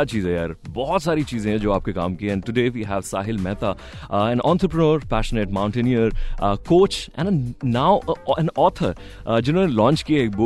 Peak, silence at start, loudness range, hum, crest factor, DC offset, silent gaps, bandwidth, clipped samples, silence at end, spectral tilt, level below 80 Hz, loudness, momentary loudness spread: -4 dBFS; 0 s; 3 LU; none; 16 dB; under 0.1%; none; 12.5 kHz; under 0.1%; 0 s; -7 dB/octave; -34 dBFS; -21 LUFS; 8 LU